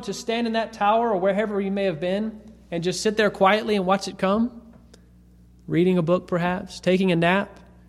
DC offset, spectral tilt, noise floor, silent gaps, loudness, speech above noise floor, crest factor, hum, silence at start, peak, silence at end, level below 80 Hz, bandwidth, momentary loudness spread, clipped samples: under 0.1%; -5.5 dB/octave; -51 dBFS; none; -23 LUFS; 29 dB; 18 dB; 60 Hz at -45 dBFS; 0 s; -4 dBFS; 0.35 s; -54 dBFS; 13 kHz; 8 LU; under 0.1%